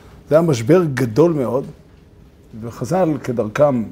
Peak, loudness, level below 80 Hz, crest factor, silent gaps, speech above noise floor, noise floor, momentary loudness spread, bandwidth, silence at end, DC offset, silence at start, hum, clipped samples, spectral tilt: 0 dBFS; -17 LUFS; -48 dBFS; 18 dB; none; 29 dB; -46 dBFS; 14 LU; 16 kHz; 0 s; under 0.1%; 0.3 s; none; under 0.1%; -7.5 dB/octave